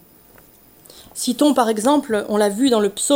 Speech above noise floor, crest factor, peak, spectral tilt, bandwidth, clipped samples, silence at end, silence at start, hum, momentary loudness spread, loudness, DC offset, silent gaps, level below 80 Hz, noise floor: 31 dB; 18 dB; -2 dBFS; -3.5 dB/octave; 16.5 kHz; under 0.1%; 0 s; 0.95 s; none; 8 LU; -18 LUFS; under 0.1%; none; -60 dBFS; -49 dBFS